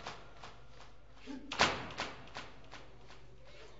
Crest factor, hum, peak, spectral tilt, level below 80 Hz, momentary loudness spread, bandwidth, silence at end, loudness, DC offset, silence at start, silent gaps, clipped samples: 30 dB; none; -14 dBFS; -1 dB/octave; -62 dBFS; 26 LU; 7.6 kHz; 0 s; -37 LUFS; 0.3%; 0 s; none; under 0.1%